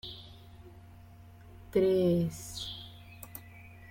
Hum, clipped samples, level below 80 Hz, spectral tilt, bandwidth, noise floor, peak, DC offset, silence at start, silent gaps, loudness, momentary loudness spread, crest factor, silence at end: none; under 0.1%; -58 dBFS; -6.5 dB/octave; 16.5 kHz; -53 dBFS; -14 dBFS; under 0.1%; 0.05 s; none; -30 LUFS; 27 LU; 20 dB; 0 s